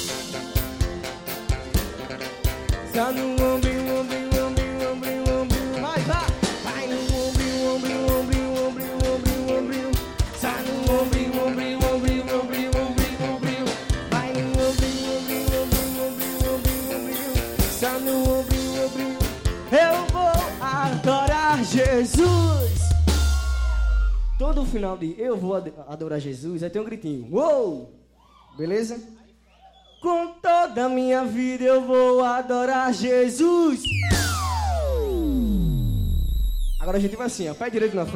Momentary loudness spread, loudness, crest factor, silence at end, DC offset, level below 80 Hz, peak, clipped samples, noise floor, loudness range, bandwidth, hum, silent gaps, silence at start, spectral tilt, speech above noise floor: 8 LU; -23 LUFS; 14 dB; 0 s; under 0.1%; -28 dBFS; -10 dBFS; under 0.1%; -54 dBFS; 6 LU; 17 kHz; none; none; 0 s; -5.5 dB/octave; 32 dB